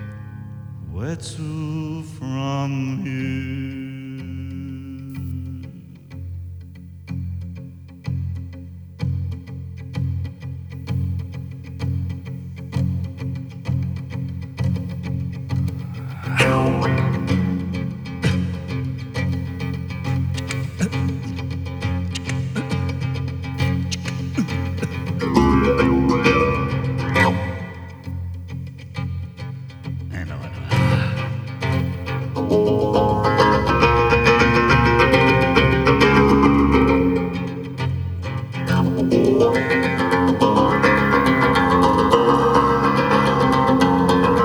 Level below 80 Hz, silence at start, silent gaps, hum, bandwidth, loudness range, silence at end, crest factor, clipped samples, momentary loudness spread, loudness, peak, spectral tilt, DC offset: -36 dBFS; 0 s; none; none; over 20 kHz; 15 LU; 0 s; 20 dB; under 0.1%; 18 LU; -20 LUFS; 0 dBFS; -6.5 dB/octave; under 0.1%